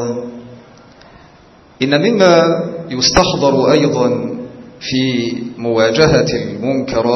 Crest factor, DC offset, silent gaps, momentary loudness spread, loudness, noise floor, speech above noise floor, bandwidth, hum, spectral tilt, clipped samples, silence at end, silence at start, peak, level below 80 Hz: 14 dB; under 0.1%; none; 14 LU; -14 LUFS; -44 dBFS; 31 dB; 8.4 kHz; none; -5 dB/octave; under 0.1%; 0 s; 0 s; 0 dBFS; -40 dBFS